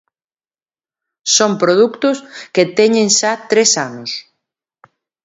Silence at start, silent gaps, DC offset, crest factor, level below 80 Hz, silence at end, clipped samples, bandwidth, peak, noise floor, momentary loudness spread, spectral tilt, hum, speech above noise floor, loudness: 1.25 s; none; under 0.1%; 16 dB; -66 dBFS; 1.05 s; under 0.1%; 8 kHz; 0 dBFS; under -90 dBFS; 13 LU; -2.5 dB/octave; none; over 76 dB; -13 LUFS